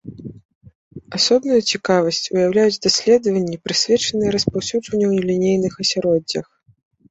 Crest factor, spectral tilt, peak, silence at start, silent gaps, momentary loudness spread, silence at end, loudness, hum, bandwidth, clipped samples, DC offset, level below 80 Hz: 16 dB; -4 dB/octave; -2 dBFS; 0.05 s; 0.45-0.49 s, 0.55-0.61 s, 0.75-0.91 s; 8 LU; 0.7 s; -18 LUFS; none; 8.2 kHz; under 0.1%; under 0.1%; -52 dBFS